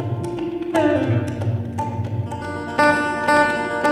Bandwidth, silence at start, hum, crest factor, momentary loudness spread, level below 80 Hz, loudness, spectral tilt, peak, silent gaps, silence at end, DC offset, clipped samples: 13.5 kHz; 0 s; none; 16 dB; 9 LU; -50 dBFS; -21 LUFS; -6.5 dB/octave; -4 dBFS; none; 0 s; under 0.1%; under 0.1%